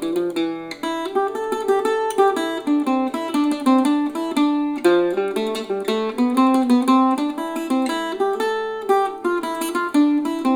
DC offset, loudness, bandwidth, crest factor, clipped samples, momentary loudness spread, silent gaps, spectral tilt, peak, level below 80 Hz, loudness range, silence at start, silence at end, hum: under 0.1%; -20 LUFS; over 20 kHz; 16 dB; under 0.1%; 7 LU; none; -4 dB/octave; -4 dBFS; -64 dBFS; 2 LU; 0 s; 0 s; none